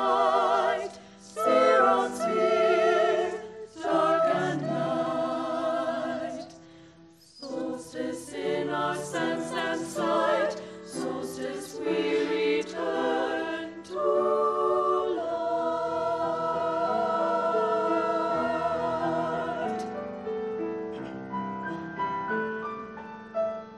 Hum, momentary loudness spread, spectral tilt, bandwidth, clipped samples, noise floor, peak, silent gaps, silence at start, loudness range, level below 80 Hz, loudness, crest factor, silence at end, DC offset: none; 12 LU; -5 dB/octave; 12.5 kHz; under 0.1%; -54 dBFS; -10 dBFS; none; 0 s; 9 LU; -68 dBFS; -28 LUFS; 18 dB; 0 s; under 0.1%